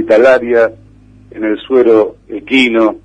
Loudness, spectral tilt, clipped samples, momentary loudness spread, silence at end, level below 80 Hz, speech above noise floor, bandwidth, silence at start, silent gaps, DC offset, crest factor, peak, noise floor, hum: -11 LUFS; -5 dB/octave; under 0.1%; 10 LU; 0.05 s; -48 dBFS; 30 dB; 9.4 kHz; 0 s; none; under 0.1%; 12 dB; 0 dBFS; -41 dBFS; none